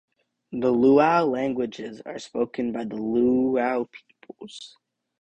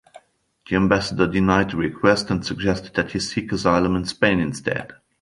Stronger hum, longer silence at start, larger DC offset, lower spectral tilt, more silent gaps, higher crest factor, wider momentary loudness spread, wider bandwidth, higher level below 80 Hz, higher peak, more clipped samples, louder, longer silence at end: neither; second, 0.5 s vs 0.7 s; neither; about the same, -6.5 dB/octave vs -5.5 dB/octave; neither; about the same, 18 dB vs 20 dB; first, 21 LU vs 7 LU; second, 9.2 kHz vs 11.5 kHz; second, -62 dBFS vs -42 dBFS; second, -6 dBFS vs -2 dBFS; neither; about the same, -23 LUFS vs -21 LUFS; first, 0.55 s vs 0.3 s